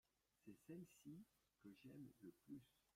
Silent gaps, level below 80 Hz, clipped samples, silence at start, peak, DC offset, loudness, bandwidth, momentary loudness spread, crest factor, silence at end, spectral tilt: none; under -90 dBFS; under 0.1%; 0.4 s; -48 dBFS; under 0.1%; -63 LUFS; 16 kHz; 7 LU; 16 dB; 0.05 s; -6.5 dB/octave